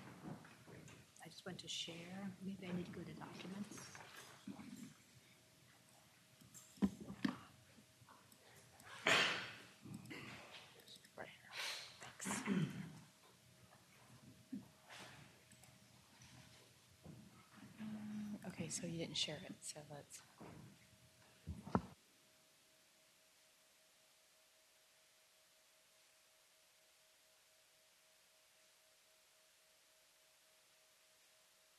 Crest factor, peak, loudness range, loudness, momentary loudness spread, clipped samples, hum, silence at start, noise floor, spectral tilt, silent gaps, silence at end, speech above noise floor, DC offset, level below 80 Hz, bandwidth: 32 dB; -18 dBFS; 26 LU; -46 LUFS; 26 LU; under 0.1%; none; 0 s; -72 dBFS; -3.5 dB/octave; none; 0.35 s; 22 dB; under 0.1%; -76 dBFS; 13 kHz